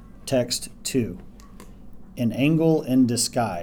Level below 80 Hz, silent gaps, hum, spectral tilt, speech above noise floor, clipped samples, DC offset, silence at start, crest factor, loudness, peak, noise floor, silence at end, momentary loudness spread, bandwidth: -48 dBFS; none; none; -5 dB/octave; 21 dB; under 0.1%; under 0.1%; 0 s; 16 dB; -23 LUFS; -8 dBFS; -43 dBFS; 0 s; 10 LU; 18 kHz